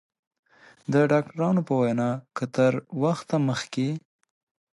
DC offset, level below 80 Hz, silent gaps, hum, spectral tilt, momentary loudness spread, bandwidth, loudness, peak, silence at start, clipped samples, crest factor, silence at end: under 0.1%; -70 dBFS; none; none; -7 dB/octave; 8 LU; 11.5 kHz; -25 LUFS; -10 dBFS; 0.9 s; under 0.1%; 16 dB; 0.75 s